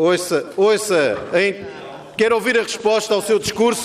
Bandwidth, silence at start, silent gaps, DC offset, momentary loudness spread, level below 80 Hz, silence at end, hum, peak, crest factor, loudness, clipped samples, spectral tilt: 15.5 kHz; 0 s; none; under 0.1%; 11 LU; -56 dBFS; 0 s; none; -6 dBFS; 12 dB; -18 LUFS; under 0.1%; -3.5 dB/octave